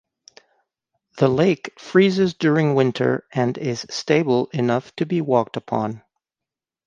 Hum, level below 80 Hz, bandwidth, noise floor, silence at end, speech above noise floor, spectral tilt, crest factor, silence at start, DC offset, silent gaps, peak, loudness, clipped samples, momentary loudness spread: none; -62 dBFS; 9 kHz; -88 dBFS; 0.9 s; 68 dB; -6.5 dB/octave; 18 dB; 1.15 s; under 0.1%; none; -2 dBFS; -20 LUFS; under 0.1%; 8 LU